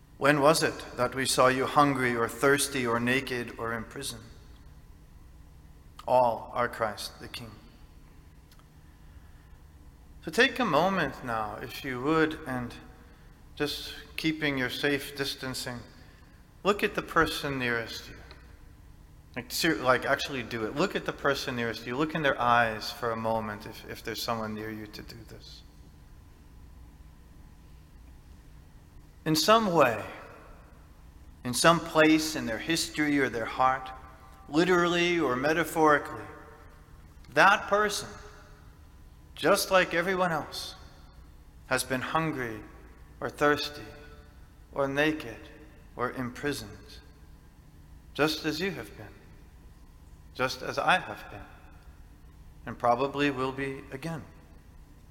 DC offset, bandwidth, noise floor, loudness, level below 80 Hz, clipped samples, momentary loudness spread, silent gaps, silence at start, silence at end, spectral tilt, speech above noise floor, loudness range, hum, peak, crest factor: under 0.1%; 17 kHz; -53 dBFS; -28 LUFS; -52 dBFS; under 0.1%; 20 LU; none; 0.2 s; 0.15 s; -4 dB/octave; 25 dB; 9 LU; none; -6 dBFS; 24 dB